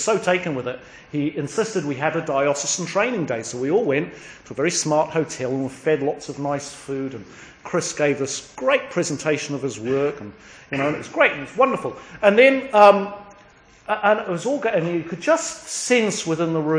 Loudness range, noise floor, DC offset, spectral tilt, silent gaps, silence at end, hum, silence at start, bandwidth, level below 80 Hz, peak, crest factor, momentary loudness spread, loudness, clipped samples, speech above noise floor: 6 LU; -50 dBFS; under 0.1%; -4 dB/octave; none; 0 s; none; 0 s; 10.5 kHz; -60 dBFS; 0 dBFS; 22 dB; 12 LU; -21 LUFS; under 0.1%; 29 dB